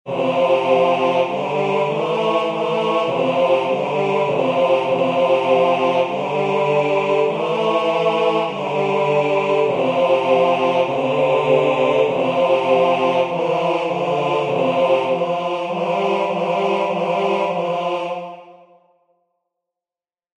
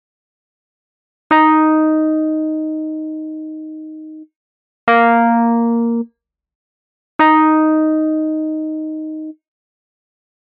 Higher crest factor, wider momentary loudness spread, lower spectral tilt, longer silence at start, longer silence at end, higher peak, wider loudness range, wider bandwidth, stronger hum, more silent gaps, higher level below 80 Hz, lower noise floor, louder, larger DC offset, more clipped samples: about the same, 16 dB vs 16 dB; second, 5 LU vs 19 LU; first, -6 dB/octave vs -3.5 dB/octave; second, 0.05 s vs 1.3 s; first, 1.85 s vs 1.15 s; about the same, -2 dBFS vs -2 dBFS; about the same, 4 LU vs 4 LU; first, 9.4 kHz vs 4.4 kHz; neither; second, none vs 4.36-4.87 s, 6.55-7.19 s; first, -62 dBFS vs -70 dBFS; first, under -90 dBFS vs -52 dBFS; second, -18 LUFS vs -15 LUFS; neither; neither